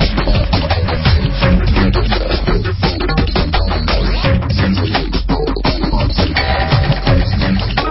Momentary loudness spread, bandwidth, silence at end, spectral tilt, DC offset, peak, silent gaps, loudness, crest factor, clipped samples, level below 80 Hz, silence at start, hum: 3 LU; 5.8 kHz; 0 s; -10 dB/octave; under 0.1%; 0 dBFS; none; -15 LUFS; 14 dB; under 0.1%; -16 dBFS; 0 s; none